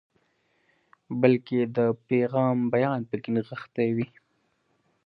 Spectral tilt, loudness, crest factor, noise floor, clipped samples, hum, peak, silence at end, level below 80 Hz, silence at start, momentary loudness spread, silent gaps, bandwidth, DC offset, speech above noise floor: -10.5 dB/octave; -26 LUFS; 22 dB; -71 dBFS; under 0.1%; none; -6 dBFS; 1 s; -70 dBFS; 1.1 s; 8 LU; none; 5.2 kHz; under 0.1%; 46 dB